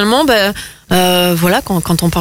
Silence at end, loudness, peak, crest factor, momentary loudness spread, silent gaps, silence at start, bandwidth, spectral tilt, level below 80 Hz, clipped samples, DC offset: 0 s; -12 LUFS; 0 dBFS; 12 dB; 6 LU; none; 0 s; 16.5 kHz; -4.5 dB/octave; -36 dBFS; under 0.1%; under 0.1%